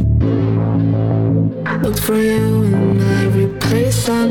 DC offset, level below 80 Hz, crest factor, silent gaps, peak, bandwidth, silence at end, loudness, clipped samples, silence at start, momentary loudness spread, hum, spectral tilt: 0.4%; -30 dBFS; 10 dB; none; -4 dBFS; 19.5 kHz; 0 s; -15 LUFS; under 0.1%; 0 s; 3 LU; none; -6.5 dB/octave